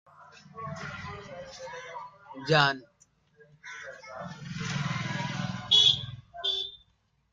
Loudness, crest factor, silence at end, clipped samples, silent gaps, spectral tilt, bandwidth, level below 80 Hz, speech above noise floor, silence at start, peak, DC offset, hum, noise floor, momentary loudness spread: -26 LUFS; 26 dB; 0.55 s; under 0.1%; none; -3.5 dB/octave; 9 kHz; -62 dBFS; 39 dB; 0.2 s; -6 dBFS; under 0.1%; none; -70 dBFS; 21 LU